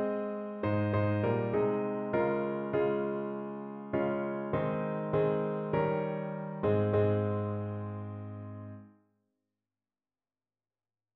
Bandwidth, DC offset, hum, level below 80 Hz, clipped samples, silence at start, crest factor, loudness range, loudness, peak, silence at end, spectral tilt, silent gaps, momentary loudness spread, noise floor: 4.5 kHz; under 0.1%; none; -64 dBFS; under 0.1%; 0 s; 16 dB; 10 LU; -32 LUFS; -16 dBFS; 2.25 s; -8 dB/octave; none; 12 LU; under -90 dBFS